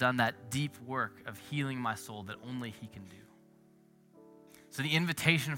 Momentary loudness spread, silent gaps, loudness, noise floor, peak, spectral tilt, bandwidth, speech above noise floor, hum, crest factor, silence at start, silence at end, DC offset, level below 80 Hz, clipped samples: 19 LU; none; -34 LUFS; -63 dBFS; -8 dBFS; -4.5 dB/octave; 16.5 kHz; 29 dB; none; 28 dB; 0 s; 0 s; under 0.1%; -72 dBFS; under 0.1%